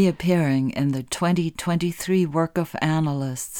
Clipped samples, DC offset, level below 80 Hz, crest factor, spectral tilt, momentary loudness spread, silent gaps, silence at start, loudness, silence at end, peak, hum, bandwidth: under 0.1%; under 0.1%; -54 dBFS; 14 dB; -6 dB/octave; 5 LU; none; 0 s; -23 LUFS; 0 s; -8 dBFS; none; 18.5 kHz